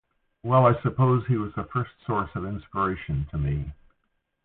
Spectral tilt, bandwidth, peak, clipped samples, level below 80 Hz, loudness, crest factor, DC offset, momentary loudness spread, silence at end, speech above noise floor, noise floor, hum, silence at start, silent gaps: -12.5 dB/octave; 4 kHz; -6 dBFS; under 0.1%; -42 dBFS; -26 LUFS; 18 dB; under 0.1%; 12 LU; 0.7 s; 50 dB; -75 dBFS; none; 0.45 s; none